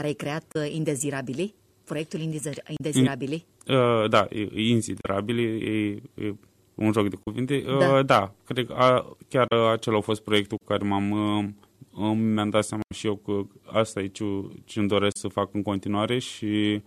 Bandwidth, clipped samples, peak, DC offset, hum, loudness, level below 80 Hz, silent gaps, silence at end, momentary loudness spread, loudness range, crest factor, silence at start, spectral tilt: 14 kHz; under 0.1%; -6 dBFS; under 0.1%; none; -26 LUFS; -62 dBFS; none; 0.05 s; 11 LU; 5 LU; 18 dB; 0 s; -5.5 dB/octave